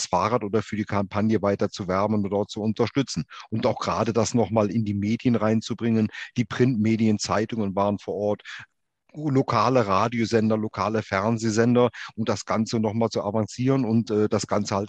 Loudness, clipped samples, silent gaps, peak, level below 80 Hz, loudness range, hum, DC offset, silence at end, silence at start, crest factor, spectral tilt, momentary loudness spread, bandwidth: -24 LUFS; under 0.1%; none; -6 dBFS; -60 dBFS; 2 LU; none; under 0.1%; 0 s; 0 s; 18 dB; -6 dB/octave; 6 LU; 8.8 kHz